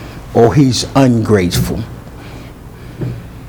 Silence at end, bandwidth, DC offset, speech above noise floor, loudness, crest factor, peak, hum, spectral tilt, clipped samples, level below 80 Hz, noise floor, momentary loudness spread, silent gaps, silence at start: 0 s; over 20 kHz; under 0.1%; 21 dB; -13 LUFS; 14 dB; 0 dBFS; none; -6 dB/octave; 0.2%; -32 dBFS; -32 dBFS; 22 LU; none; 0 s